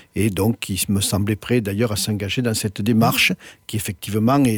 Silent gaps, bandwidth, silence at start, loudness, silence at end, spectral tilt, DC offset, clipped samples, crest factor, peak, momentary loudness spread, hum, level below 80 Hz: none; over 20 kHz; 0.15 s; -20 LUFS; 0 s; -4.5 dB/octave; under 0.1%; under 0.1%; 16 dB; -4 dBFS; 9 LU; none; -48 dBFS